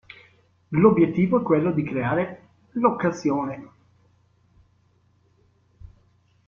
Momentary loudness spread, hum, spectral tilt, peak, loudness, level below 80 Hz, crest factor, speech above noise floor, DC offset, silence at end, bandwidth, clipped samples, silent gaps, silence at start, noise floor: 14 LU; none; -8.5 dB/octave; -6 dBFS; -22 LUFS; -58 dBFS; 20 dB; 41 dB; under 0.1%; 2.8 s; 7.2 kHz; under 0.1%; none; 0.7 s; -62 dBFS